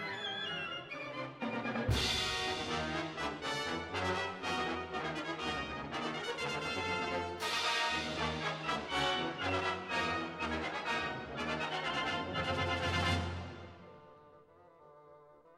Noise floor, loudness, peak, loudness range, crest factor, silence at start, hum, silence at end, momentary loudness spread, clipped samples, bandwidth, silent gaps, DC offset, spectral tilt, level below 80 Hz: -61 dBFS; -36 LUFS; -20 dBFS; 3 LU; 16 dB; 0 s; none; 0 s; 7 LU; under 0.1%; 13.5 kHz; none; under 0.1%; -4 dB/octave; -54 dBFS